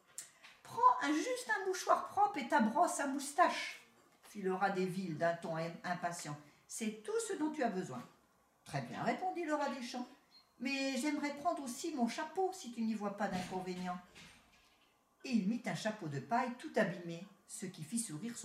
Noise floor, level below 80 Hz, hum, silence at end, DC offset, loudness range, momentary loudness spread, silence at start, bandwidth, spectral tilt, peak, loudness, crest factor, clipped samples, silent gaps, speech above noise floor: -72 dBFS; -80 dBFS; none; 0 s; under 0.1%; 7 LU; 15 LU; 0.2 s; 16 kHz; -4.5 dB/octave; -16 dBFS; -38 LUFS; 22 dB; under 0.1%; none; 34 dB